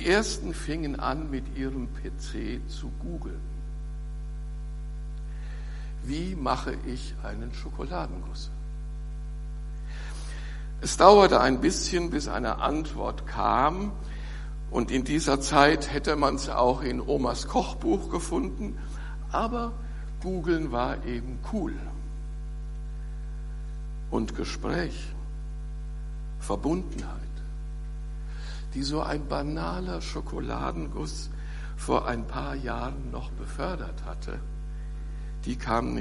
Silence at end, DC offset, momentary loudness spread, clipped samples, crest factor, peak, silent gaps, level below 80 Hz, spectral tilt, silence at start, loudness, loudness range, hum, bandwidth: 0 s; under 0.1%; 14 LU; under 0.1%; 28 dB; -2 dBFS; none; -34 dBFS; -5 dB/octave; 0 s; -30 LUFS; 13 LU; none; 11.5 kHz